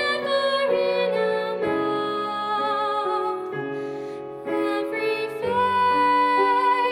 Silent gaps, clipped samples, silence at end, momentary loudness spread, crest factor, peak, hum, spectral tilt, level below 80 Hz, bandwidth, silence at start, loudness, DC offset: none; under 0.1%; 0 s; 11 LU; 14 dB; -10 dBFS; none; -5 dB/octave; -66 dBFS; 16 kHz; 0 s; -23 LUFS; under 0.1%